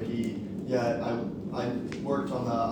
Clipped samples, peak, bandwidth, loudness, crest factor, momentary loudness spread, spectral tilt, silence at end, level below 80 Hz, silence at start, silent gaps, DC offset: under 0.1%; -16 dBFS; 19.5 kHz; -31 LUFS; 14 dB; 5 LU; -7 dB/octave; 0 s; -58 dBFS; 0 s; none; under 0.1%